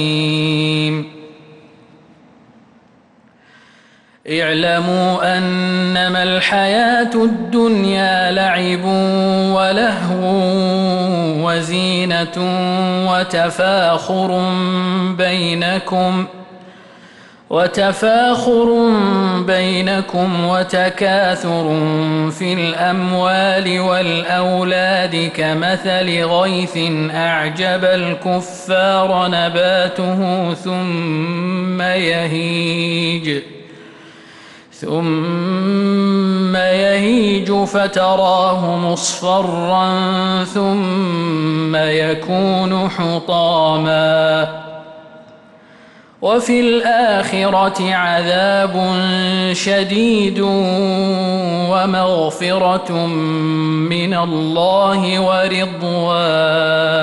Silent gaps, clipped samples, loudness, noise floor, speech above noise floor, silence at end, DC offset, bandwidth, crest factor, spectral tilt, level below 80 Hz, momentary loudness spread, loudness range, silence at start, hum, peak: none; under 0.1%; -15 LUFS; -50 dBFS; 35 dB; 0 s; under 0.1%; 11.5 kHz; 12 dB; -5.5 dB/octave; -54 dBFS; 5 LU; 4 LU; 0 s; none; -4 dBFS